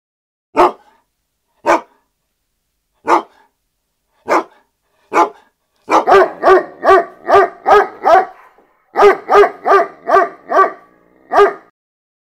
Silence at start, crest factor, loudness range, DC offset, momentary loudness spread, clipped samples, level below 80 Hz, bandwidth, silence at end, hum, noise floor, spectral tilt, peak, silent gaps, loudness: 0.55 s; 14 dB; 9 LU; under 0.1%; 8 LU; 0.1%; -50 dBFS; 14.5 kHz; 0.8 s; none; -69 dBFS; -4 dB/octave; 0 dBFS; none; -12 LUFS